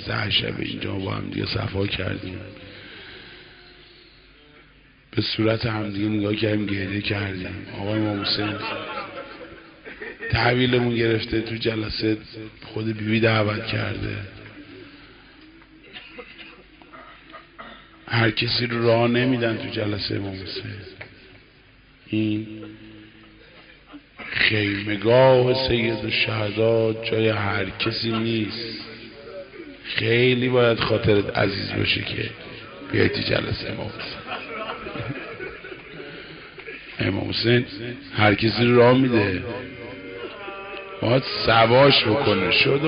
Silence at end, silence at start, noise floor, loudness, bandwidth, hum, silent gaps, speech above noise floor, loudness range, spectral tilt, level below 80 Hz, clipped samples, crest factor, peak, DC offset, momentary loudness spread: 0 s; 0 s; -53 dBFS; -22 LUFS; 5.4 kHz; none; none; 31 dB; 12 LU; -4 dB/octave; -48 dBFS; under 0.1%; 18 dB; -4 dBFS; under 0.1%; 21 LU